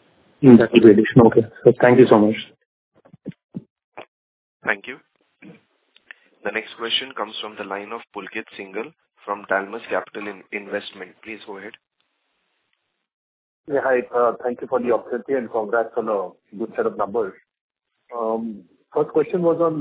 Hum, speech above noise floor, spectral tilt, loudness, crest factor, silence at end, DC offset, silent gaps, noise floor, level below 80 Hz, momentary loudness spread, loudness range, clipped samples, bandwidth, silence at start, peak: none; 54 dB; -10.5 dB/octave; -19 LUFS; 20 dB; 0 s; under 0.1%; 2.66-2.92 s, 3.44-3.49 s, 3.70-3.76 s, 3.84-3.92 s, 4.08-4.60 s, 13.14-13.64 s, 17.61-17.69 s; -73 dBFS; -58 dBFS; 24 LU; 16 LU; under 0.1%; 4 kHz; 0.4 s; 0 dBFS